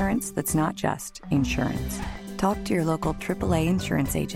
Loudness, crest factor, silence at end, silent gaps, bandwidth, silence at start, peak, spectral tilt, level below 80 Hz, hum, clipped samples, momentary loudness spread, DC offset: -26 LUFS; 16 dB; 0 s; none; 16.5 kHz; 0 s; -10 dBFS; -5.5 dB/octave; -40 dBFS; none; under 0.1%; 7 LU; under 0.1%